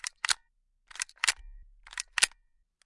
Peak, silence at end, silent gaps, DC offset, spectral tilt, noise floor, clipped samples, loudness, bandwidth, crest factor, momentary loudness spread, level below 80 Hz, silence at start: -2 dBFS; 0.55 s; none; under 0.1%; 3 dB/octave; -71 dBFS; under 0.1%; -30 LUFS; 11.5 kHz; 32 dB; 14 LU; -56 dBFS; 0.05 s